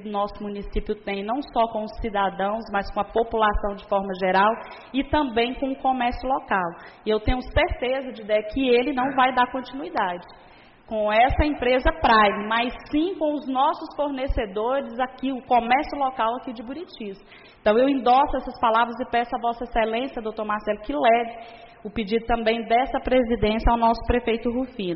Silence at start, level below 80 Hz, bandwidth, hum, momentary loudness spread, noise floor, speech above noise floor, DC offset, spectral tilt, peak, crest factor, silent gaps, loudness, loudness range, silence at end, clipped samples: 0 s; -36 dBFS; 5.8 kHz; none; 10 LU; -50 dBFS; 26 dB; under 0.1%; -3.5 dB/octave; -8 dBFS; 16 dB; none; -23 LUFS; 3 LU; 0 s; under 0.1%